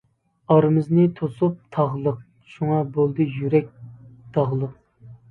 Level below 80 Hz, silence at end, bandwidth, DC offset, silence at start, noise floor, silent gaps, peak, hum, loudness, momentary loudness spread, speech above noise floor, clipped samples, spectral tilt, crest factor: -60 dBFS; 0.15 s; 4.4 kHz; under 0.1%; 0.5 s; -47 dBFS; none; -2 dBFS; none; -22 LUFS; 10 LU; 26 dB; under 0.1%; -11 dB/octave; 20 dB